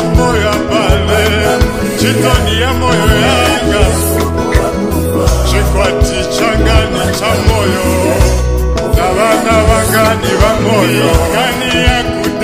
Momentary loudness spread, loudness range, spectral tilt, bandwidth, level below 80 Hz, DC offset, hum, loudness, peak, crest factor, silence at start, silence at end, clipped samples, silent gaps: 4 LU; 2 LU; -5 dB/octave; 16 kHz; -16 dBFS; under 0.1%; none; -11 LUFS; 0 dBFS; 10 dB; 0 s; 0 s; 0.3%; none